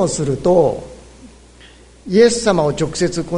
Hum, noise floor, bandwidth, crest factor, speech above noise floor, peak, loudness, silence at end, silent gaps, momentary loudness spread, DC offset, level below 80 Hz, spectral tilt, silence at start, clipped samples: none; -43 dBFS; 11 kHz; 16 dB; 28 dB; 0 dBFS; -15 LUFS; 0 s; none; 7 LU; under 0.1%; -42 dBFS; -5 dB/octave; 0 s; under 0.1%